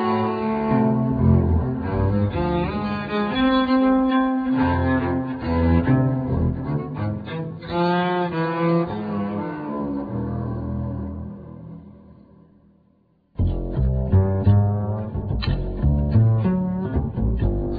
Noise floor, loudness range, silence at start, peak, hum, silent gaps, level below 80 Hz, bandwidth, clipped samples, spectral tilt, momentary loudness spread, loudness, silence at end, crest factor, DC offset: -61 dBFS; 10 LU; 0 s; -6 dBFS; none; none; -32 dBFS; 5 kHz; under 0.1%; -11 dB/octave; 10 LU; -22 LUFS; 0 s; 16 dB; under 0.1%